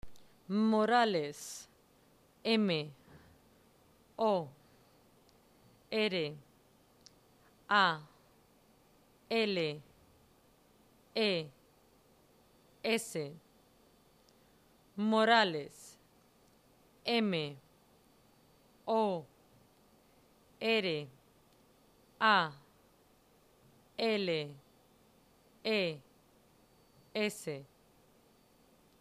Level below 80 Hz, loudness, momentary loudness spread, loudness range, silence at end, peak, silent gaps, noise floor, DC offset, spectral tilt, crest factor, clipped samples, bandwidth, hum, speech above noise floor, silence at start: -74 dBFS; -33 LUFS; 20 LU; 7 LU; 1.35 s; -14 dBFS; none; -67 dBFS; under 0.1%; -4.5 dB/octave; 24 dB; under 0.1%; 15 kHz; none; 35 dB; 0.05 s